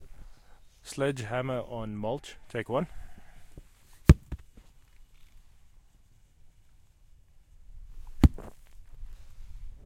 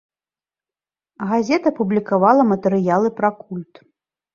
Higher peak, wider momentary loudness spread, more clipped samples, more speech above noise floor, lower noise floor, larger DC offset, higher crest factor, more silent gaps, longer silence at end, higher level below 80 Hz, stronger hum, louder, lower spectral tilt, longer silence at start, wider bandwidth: about the same, -2 dBFS vs -2 dBFS; first, 29 LU vs 16 LU; neither; second, 26 dB vs over 72 dB; second, -59 dBFS vs under -90 dBFS; neither; first, 30 dB vs 18 dB; neither; second, 0.1 s vs 0.7 s; first, -38 dBFS vs -64 dBFS; neither; second, -29 LUFS vs -18 LUFS; about the same, -7 dB/octave vs -7.5 dB/octave; second, 0 s vs 1.2 s; first, 16 kHz vs 7.2 kHz